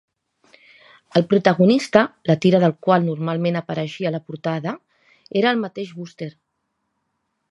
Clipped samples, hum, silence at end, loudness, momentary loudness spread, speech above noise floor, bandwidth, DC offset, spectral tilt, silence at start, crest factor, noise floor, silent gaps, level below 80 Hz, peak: under 0.1%; none; 1.2 s; -19 LUFS; 17 LU; 55 dB; 11 kHz; under 0.1%; -7 dB/octave; 1.15 s; 20 dB; -74 dBFS; none; -64 dBFS; 0 dBFS